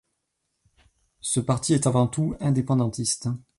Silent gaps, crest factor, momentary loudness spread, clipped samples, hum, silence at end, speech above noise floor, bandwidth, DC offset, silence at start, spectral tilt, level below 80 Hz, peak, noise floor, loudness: none; 16 dB; 5 LU; under 0.1%; none; 0.2 s; 54 dB; 11.5 kHz; under 0.1%; 1.25 s; -5.5 dB/octave; -52 dBFS; -10 dBFS; -78 dBFS; -24 LUFS